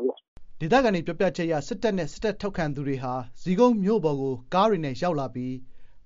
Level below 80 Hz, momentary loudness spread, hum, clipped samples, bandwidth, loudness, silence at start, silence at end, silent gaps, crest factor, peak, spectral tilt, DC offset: -48 dBFS; 11 LU; none; under 0.1%; 7.4 kHz; -26 LUFS; 0 s; 0.05 s; 0.28-0.36 s; 20 dB; -6 dBFS; -5.5 dB/octave; under 0.1%